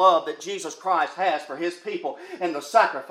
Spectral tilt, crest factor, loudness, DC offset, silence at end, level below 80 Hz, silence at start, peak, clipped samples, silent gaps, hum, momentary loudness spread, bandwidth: -3 dB/octave; 18 dB; -25 LUFS; under 0.1%; 0 s; -90 dBFS; 0 s; -4 dBFS; under 0.1%; none; none; 11 LU; 14.5 kHz